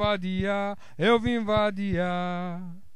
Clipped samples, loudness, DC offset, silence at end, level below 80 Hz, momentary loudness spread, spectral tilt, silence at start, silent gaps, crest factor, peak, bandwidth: under 0.1%; -27 LUFS; 1%; 0.15 s; -48 dBFS; 10 LU; -7 dB/octave; 0 s; none; 18 dB; -8 dBFS; 11 kHz